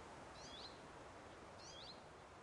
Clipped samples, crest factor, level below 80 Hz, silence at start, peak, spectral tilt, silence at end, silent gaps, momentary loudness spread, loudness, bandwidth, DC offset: under 0.1%; 14 dB; -72 dBFS; 0 s; -44 dBFS; -3 dB/octave; 0 s; none; 4 LU; -56 LUFS; 11 kHz; under 0.1%